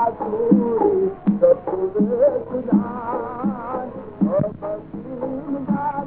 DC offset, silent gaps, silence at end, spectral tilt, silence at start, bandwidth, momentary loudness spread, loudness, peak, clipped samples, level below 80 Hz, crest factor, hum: under 0.1%; none; 0 s; -13.5 dB/octave; 0 s; 3.2 kHz; 12 LU; -21 LUFS; -2 dBFS; under 0.1%; -52 dBFS; 18 dB; none